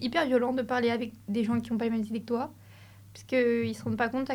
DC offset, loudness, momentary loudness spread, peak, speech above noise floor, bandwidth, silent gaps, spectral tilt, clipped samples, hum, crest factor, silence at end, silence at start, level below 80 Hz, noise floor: under 0.1%; -29 LUFS; 7 LU; -14 dBFS; 23 dB; 16 kHz; none; -6 dB/octave; under 0.1%; none; 16 dB; 0 s; 0 s; -64 dBFS; -52 dBFS